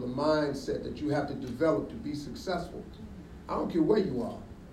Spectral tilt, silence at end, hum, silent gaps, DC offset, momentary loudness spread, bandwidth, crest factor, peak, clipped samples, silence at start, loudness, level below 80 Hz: -7 dB/octave; 0 s; none; none; under 0.1%; 18 LU; 13.5 kHz; 18 dB; -12 dBFS; under 0.1%; 0 s; -31 LUFS; -52 dBFS